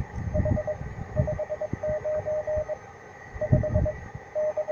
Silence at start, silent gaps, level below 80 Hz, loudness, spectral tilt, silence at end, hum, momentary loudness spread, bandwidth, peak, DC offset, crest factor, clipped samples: 0 s; none; -38 dBFS; -29 LUFS; -9 dB/octave; 0 s; none; 12 LU; 7 kHz; -8 dBFS; under 0.1%; 20 dB; under 0.1%